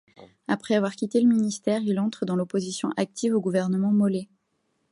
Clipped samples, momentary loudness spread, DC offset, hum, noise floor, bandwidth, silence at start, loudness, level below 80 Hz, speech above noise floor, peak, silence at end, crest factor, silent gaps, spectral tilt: under 0.1%; 7 LU; under 0.1%; none; -73 dBFS; 11 kHz; 0.2 s; -25 LUFS; -68 dBFS; 49 dB; -10 dBFS; 0.7 s; 16 dB; none; -6 dB/octave